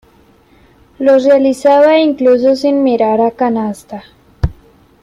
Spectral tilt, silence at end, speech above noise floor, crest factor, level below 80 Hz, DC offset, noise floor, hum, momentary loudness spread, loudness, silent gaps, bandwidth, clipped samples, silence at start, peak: -6.5 dB/octave; 0.5 s; 37 dB; 12 dB; -34 dBFS; under 0.1%; -47 dBFS; none; 13 LU; -11 LUFS; none; 12 kHz; under 0.1%; 1 s; -2 dBFS